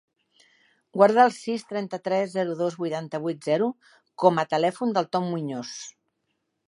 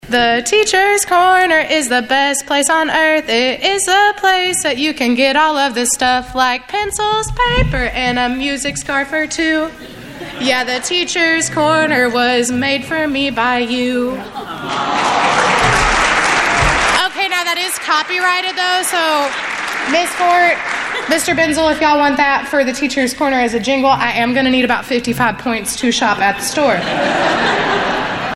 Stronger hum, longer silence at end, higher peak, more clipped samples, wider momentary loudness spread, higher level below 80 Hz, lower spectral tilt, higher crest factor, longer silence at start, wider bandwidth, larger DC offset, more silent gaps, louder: neither; first, 0.75 s vs 0 s; second, -4 dBFS vs 0 dBFS; neither; first, 13 LU vs 6 LU; second, -78 dBFS vs -34 dBFS; first, -5.5 dB/octave vs -2.5 dB/octave; first, 22 dB vs 14 dB; first, 0.95 s vs 0.05 s; second, 11 kHz vs 16 kHz; neither; neither; second, -25 LUFS vs -14 LUFS